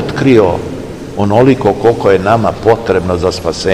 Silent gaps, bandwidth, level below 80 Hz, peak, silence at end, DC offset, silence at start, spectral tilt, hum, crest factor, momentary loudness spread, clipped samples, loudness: none; 14 kHz; -34 dBFS; 0 dBFS; 0 s; 0.8%; 0 s; -6.5 dB/octave; none; 10 dB; 10 LU; 2%; -11 LUFS